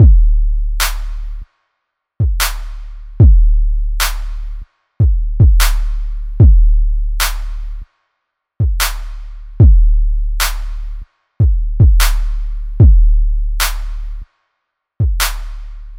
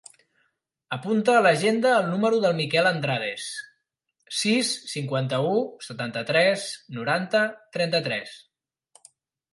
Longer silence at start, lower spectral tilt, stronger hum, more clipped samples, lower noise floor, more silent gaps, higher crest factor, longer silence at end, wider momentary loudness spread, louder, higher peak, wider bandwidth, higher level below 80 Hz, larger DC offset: second, 0 s vs 0.9 s; about the same, -4.5 dB/octave vs -4.5 dB/octave; neither; neither; second, -73 dBFS vs -77 dBFS; neither; second, 12 dB vs 18 dB; second, 0 s vs 1.15 s; first, 21 LU vs 13 LU; first, -15 LUFS vs -24 LUFS; first, 0 dBFS vs -6 dBFS; first, 17 kHz vs 11.5 kHz; first, -14 dBFS vs -74 dBFS; neither